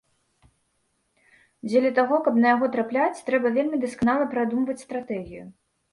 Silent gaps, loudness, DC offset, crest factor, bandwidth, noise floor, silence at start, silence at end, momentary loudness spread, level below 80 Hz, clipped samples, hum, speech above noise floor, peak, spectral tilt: none; -23 LUFS; under 0.1%; 18 dB; 11.5 kHz; -72 dBFS; 1.65 s; 0.4 s; 13 LU; -60 dBFS; under 0.1%; none; 49 dB; -6 dBFS; -6 dB/octave